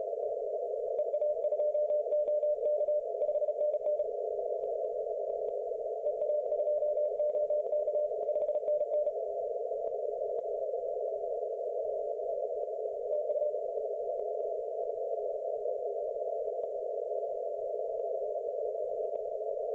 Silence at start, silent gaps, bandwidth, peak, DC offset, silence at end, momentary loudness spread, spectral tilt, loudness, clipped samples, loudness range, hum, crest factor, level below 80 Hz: 0 s; none; 2.4 kHz; -24 dBFS; under 0.1%; 0 s; 5 LU; -7 dB/octave; -34 LUFS; under 0.1%; 4 LU; none; 10 dB; -76 dBFS